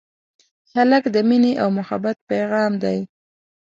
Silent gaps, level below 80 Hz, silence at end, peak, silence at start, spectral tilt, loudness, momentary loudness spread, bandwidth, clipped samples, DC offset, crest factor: 2.21-2.27 s; -66 dBFS; 0.6 s; -4 dBFS; 0.75 s; -7 dB/octave; -19 LUFS; 9 LU; 7.6 kHz; under 0.1%; under 0.1%; 16 dB